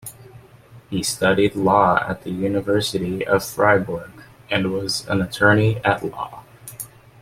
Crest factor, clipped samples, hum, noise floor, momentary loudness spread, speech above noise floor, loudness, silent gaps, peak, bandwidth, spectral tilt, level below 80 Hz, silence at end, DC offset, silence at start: 20 dB; under 0.1%; none; -46 dBFS; 18 LU; 27 dB; -20 LUFS; none; -2 dBFS; 16.5 kHz; -5 dB/octave; -50 dBFS; 0.35 s; under 0.1%; 0.05 s